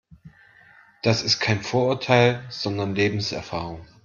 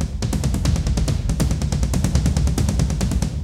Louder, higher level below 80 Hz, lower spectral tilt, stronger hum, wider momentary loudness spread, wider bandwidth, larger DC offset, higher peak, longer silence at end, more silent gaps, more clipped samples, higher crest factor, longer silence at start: about the same, -23 LUFS vs -21 LUFS; second, -56 dBFS vs -22 dBFS; about the same, -5 dB/octave vs -6 dB/octave; neither; first, 12 LU vs 3 LU; second, 7.4 kHz vs 16 kHz; second, under 0.1% vs 0.2%; about the same, -4 dBFS vs -4 dBFS; first, 0.2 s vs 0 s; neither; neither; about the same, 20 dB vs 16 dB; first, 0.25 s vs 0 s